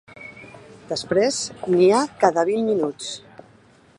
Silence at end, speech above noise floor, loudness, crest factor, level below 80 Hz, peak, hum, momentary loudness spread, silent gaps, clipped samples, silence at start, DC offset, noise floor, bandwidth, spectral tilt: 0.8 s; 33 dB; -21 LUFS; 20 dB; -62 dBFS; -2 dBFS; none; 22 LU; none; under 0.1%; 0.15 s; under 0.1%; -53 dBFS; 11 kHz; -4.5 dB/octave